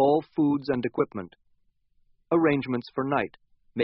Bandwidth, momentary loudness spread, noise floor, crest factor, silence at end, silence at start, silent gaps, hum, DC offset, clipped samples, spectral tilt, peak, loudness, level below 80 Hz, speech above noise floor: 5.8 kHz; 14 LU; -67 dBFS; 18 dB; 0 s; 0 s; none; none; under 0.1%; under 0.1%; -6 dB/octave; -10 dBFS; -26 LUFS; -64 dBFS; 41 dB